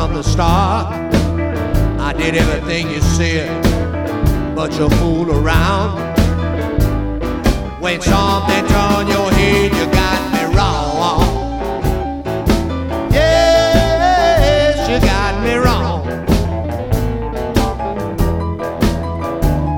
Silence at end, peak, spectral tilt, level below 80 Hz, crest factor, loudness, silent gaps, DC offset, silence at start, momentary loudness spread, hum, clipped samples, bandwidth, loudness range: 0 s; 0 dBFS; -5.5 dB/octave; -22 dBFS; 14 dB; -15 LUFS; none; under 0.1%; 0 s; 8 LU; none; under 0.1%; 18 kHz; 4 LU